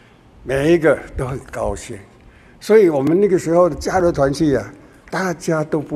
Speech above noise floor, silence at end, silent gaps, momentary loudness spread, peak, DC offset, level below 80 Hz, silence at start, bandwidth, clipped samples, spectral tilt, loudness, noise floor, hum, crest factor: 29 dB; 0 s; none; 16 LU; 0 dBFS; under 0.1%; -40 dBFS; 0.45 s; 13.5 kHz; under 0.1%; -6.5 dB/octave; -17 LUFS; -45 dBFS; none; 16 dB